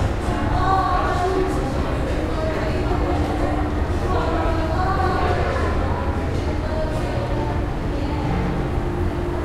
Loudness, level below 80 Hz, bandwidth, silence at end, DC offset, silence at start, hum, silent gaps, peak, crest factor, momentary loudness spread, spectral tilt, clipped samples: -22 LUFS; -26 dBFS; 13 kHz; 0 s; under 0.1%; 0 s; none; none; -4 dBFS; 16 dB; 4 LU; -7 dB/octave; under 0.1%